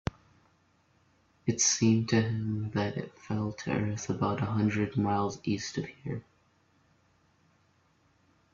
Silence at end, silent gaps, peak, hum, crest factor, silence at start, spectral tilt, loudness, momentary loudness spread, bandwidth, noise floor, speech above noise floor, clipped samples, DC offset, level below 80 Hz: 2.35 s; none; -12 dBFS; none; 20 dB; 1.45 s; -4.5 dB/octave; -30 LUFS; 13 LU; 8 kHz; -68 dBFS; 38 dB; under 0.1%; under 0.1%; -60 dBFS